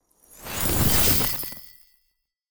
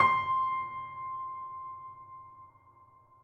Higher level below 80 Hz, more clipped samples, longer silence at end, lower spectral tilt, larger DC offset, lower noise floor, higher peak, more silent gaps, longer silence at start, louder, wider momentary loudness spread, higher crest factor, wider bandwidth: first, -38 dBFS vs -74 dBFS; neither; second, 0 s vs 0.4 s; second, -3 dB/octave vs -5 dB/octave; neither; first, -73 dBFS vs -60 dBFS; first, -4 dBFS vs -12 dBFS; neither; about the same, 0 s vs 0 s; first, -19 LUFS vs -33 LUFS; second, 17 LU vs 21 LU; about the same, 20 dB vs 22 dB; first, over 20 kHz vs 7.6 kHz